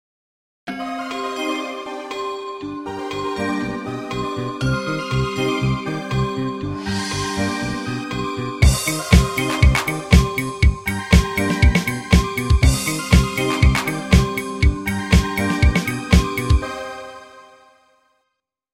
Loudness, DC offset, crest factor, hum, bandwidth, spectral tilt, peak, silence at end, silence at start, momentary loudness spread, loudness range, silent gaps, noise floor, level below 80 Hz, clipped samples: -20 LUFS; 0.2%; 20 dB; none; 16.5 kHz; -5.5 dB/octave; 0 dBFS; 1.3 s; 0.65 s; 12 LU; 8 LU; none; -76 dBFS; -24 dBFS; under 0.1%